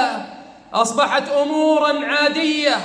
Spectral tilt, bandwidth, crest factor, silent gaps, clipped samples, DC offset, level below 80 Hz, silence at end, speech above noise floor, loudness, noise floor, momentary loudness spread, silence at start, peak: -2.5 dB/octave; 10.5 kHz; 14 dB; none; under 0.1%; under 0.1%; -66 dBFS; 0 s; 21 dB; -18 LUFS; -38 dBFS; 8 LU; 0 s; -4 dBFS